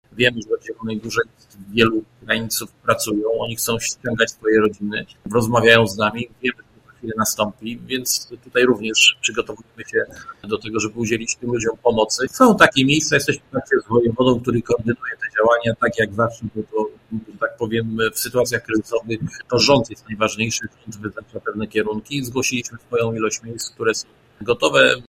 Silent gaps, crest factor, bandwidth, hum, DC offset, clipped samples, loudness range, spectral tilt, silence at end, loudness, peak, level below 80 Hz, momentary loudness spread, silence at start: none; 20 dB; 16 kHz; none; under 0.1%; under 0.1%; 6 LU; -3.5 dB/octave; 0.05 s; -19 LUFS; 0 dBFS; -50 dBFS; 14 LU; 0.15 s